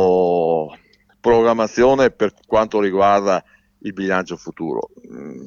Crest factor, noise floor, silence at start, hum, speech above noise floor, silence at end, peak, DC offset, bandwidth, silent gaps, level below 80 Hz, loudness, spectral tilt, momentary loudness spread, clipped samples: 14 dB; -51 dBFS; 0 s; none; 33 dB; 0 s; -4 dBFS; under 0.1%; 7.2 kHz; none; -48 dBFS; -18 LUFS; -6 dB/octave; 16 LU; under 0.1%